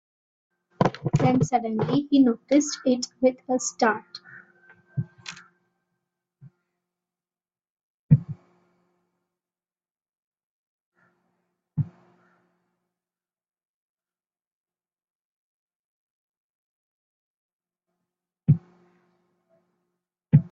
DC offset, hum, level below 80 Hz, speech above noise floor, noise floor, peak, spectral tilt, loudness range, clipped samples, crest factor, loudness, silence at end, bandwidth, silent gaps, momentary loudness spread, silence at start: under 0.1%; none; -60 dBFS; over 67 dB; under -90 dBFS; -4 dBFS; -6.5 dB/octave; 17 LU; under 0.1%; 24 dB; -24 LUFS; 0.05 s; 8 kHz; 7.70-7.77 s, 7.83-8.09 s, 10.09-10.32 s, 10.44-10.92 s, 13.65-13.98 s, 14.47-14.64 s, 15.04-15.68 s, 15.75-17.60 s; 20 LU; 0.8 s